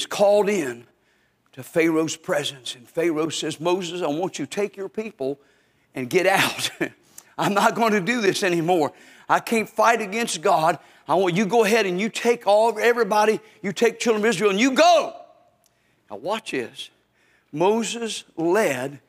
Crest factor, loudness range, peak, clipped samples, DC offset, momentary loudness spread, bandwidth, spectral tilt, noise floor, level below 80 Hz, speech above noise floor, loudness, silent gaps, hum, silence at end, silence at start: 20 dB; 6 LU; -2 dBFS; under 0.1%; under 0.1%; 13 LU; 16 kHz; -4 dB/octave; -64 dBFS; -74 dBFS; 43 dB; -22 LUFS; none; none; 0.1 s; 0 s